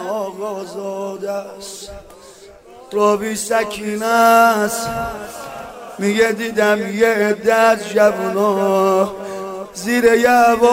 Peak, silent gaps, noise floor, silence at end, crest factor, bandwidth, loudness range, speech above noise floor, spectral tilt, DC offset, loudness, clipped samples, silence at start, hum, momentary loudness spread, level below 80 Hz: -2 dBFS; none; -41 dBFS; 0 s; 16 dB; 16 kHz; 7 LU; 25 dB; -4 dB/octave; under 0.1%; -16 LUFS; under 0.1%; 0 s; none; 18 LU; -50 dBFS